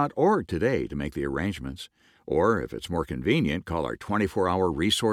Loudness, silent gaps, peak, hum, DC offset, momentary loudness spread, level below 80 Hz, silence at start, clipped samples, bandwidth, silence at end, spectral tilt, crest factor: -26 LUFS; none; -10 dBFS; none; under 0.1%; 8 LU; -46 dBFS; 0 s; under 0.1%; 16 kHz; 0 s; -5.5 dB/octave; 16 dB